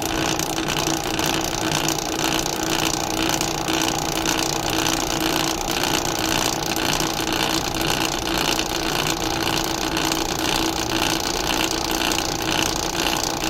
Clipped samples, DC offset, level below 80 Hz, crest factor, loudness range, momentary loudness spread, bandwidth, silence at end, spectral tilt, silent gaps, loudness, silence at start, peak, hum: under 0.1%; under 0.1%; -38 dBFS; 18 dB; 0 LU; 1 LU; 16.5 kHz; 0 s; -2.5 dB/octave; none; -21 LUFS; 0 s; -4 dBFS; none